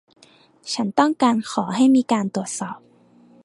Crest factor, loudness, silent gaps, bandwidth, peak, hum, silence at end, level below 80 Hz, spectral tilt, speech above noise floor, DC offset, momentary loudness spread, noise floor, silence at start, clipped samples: 20 dB; -20 LUFS; none; 11.5 kHz; -2 dBFS; none; 0.65 s; -70 dBFS; -4.5 dB/octave; 34 dB; under 0.1%; 15 LU; -53 dBFS; 0.65 s; under 0.1%